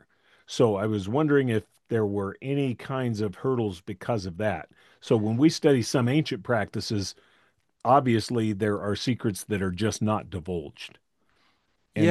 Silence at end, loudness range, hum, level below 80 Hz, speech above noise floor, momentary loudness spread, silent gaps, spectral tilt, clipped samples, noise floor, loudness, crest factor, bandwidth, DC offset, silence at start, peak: 0 s; 4 LU; none; -64 dBFS; 44 dB; 12 LU; none; -6 dB/octave; under 0.1%; -70 dBFS; -27 LUFS; 20 dB; 12.5 kHz; under 0.1%; 0.5 s; -6 dBFS